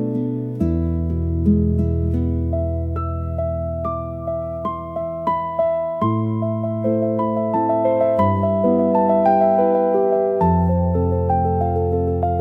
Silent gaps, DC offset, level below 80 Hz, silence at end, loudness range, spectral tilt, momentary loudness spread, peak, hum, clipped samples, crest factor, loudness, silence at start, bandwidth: none; under 0.1%; -36 dBFS; 0 s; 7 LU; -11.5 dB/octave; 8 LU; -6 dBFS; none; under 0.1%; 14 dB; -20 LUFS; 0 s; 3.6 kHz